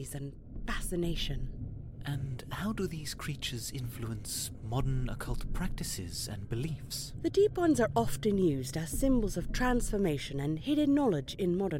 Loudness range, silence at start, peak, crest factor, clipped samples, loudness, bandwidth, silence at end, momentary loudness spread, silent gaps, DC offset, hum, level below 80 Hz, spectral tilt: 7 LU; 0 s; -14 dBFS; 18 dB; under 0.1%; -33 LUFS; 16.5 kHz; 0 s; 11 LU; none; under 0.1%; none; -42 dBFS; -5.5 dB/octave